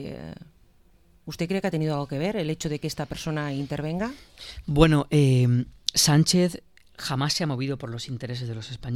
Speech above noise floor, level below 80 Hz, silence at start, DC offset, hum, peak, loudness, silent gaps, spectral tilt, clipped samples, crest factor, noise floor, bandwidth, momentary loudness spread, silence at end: 34 dB; -44 dBFS; 0 s; under 0.1%; none; -2 dBFS; -25 LUFS; none; -5 dB/octave; under 0.1%; 24 dB; -59 dBFS; 15.5 kHz; 18 LU; 0 s